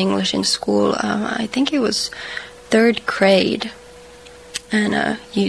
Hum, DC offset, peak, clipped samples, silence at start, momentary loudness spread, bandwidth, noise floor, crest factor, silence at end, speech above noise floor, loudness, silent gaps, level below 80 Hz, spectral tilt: none; 0.1%; -2 dBFS; under 0.1%; 0 s; 14 LU; 11 kHz; -41 dBFS; 18 dB; 0 s; 23 dB; -18 LUFS; none; -52 dBFS; -4 dB/octave